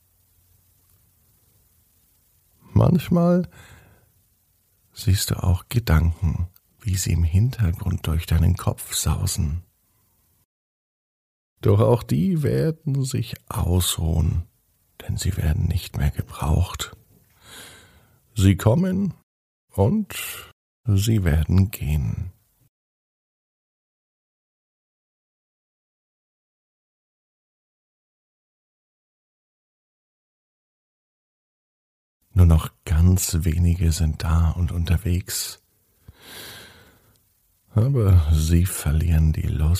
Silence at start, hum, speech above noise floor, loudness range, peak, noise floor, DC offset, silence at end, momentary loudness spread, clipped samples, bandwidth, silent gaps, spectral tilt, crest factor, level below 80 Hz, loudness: 2.7 s; none; 44 dB; 5 LU; -4 dBFS; -64 dBFS; under 0.1%; 0 s; 14 LU; under 0.1%; 15.5 kHz; 10.45-11.56 s, 19.23-19.68 s, 20.52-20.84 s, 22.69-32.20 s; -6 dB/octave; 20 dB; -32 dBFS; -22 LUFS